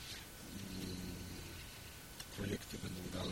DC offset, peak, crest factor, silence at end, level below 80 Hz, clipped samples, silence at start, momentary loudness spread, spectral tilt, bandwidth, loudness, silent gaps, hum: under 0.1%; -26 dBFS; 20 dB; 0 s; -58 dBFS; under 0.1%; 0 s; 7 LU; -4 dB/octave; 16.5 kHz; -47 LUFS; none; none